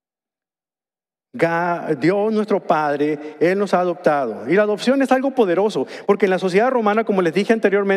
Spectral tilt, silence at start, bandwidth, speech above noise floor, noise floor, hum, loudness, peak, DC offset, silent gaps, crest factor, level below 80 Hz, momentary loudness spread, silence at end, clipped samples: -6.5 dB/octave; 1.35 s; 12.5 kHz; over 72 dB; under -90 dBFS; none; -18 LUFS; -2 dBFS; under 0.1%; none; 16 dB; -70 dBFS; 5 LU; 0 s; under 0.1%